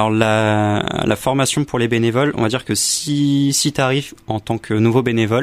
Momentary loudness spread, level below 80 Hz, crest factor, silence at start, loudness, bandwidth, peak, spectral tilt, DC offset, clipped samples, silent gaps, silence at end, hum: 6 LU; -48 dBFS; 16 dB; 0 s; -17 LUFS; 15.5 kHz; 0 dBFS; -4.5 dB/octave; under 0.1%; under 0.1%; none; 0 s; none